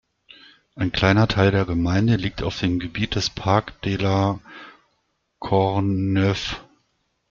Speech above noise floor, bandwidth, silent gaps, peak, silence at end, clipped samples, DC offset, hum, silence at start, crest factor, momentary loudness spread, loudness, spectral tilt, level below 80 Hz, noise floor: 50 dB; 7.4 kHz; none; -4 dBFS; 0.7 s; under 0.1%; under 0.1%; none; 0.75 s; 20 dB; 11 LU; -21 LUFS; -6.5 dB/octave; -44 dBFS; -71 dBFS